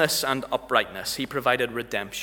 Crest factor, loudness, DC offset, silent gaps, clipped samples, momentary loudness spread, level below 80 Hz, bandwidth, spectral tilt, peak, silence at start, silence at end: 22 dB; -25 LUFS; under 0.1%; none; under 0.1%; 6 LU; -56 dBFS; 20 kHz; -2.5 dB/octave; -4 dBFS; 0 s; 0 s